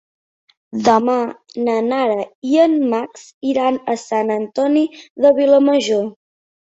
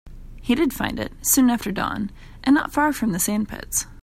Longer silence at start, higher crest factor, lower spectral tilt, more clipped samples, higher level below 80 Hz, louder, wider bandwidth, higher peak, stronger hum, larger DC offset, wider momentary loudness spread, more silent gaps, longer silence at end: first, 0.75 s vs 0.05 s; about the same, 16 dB vs 18 dB; first, -5 dB/octave vs -3.5 dB/octave; neither; second, -64 dBFS vs -42 dBFS; first, -17 LUFS vs -22 LUFS; second, 8 kHz vs 16 kHz; about the same, -2 dBFS vs -4 dBFS; neither; neither; about the same, 10 LU vs 10 LU; first, 2.35-2.42 s, 3.34-3.41 s, 5.10-5.15 s vs none; first, 0.55 s vs 0 s